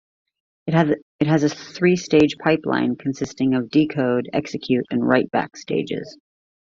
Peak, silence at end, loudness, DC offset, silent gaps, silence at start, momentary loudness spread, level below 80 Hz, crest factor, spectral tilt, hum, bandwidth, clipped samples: -2 dBFS; 0.65 s; -21 LUFS; under 0.1%; 1.02-1.19 s; 0.65 s; 8 LU; -58 dBFS; 20 dB; -6.5 dB/octave; none; 7.4 kHz; under 0.1%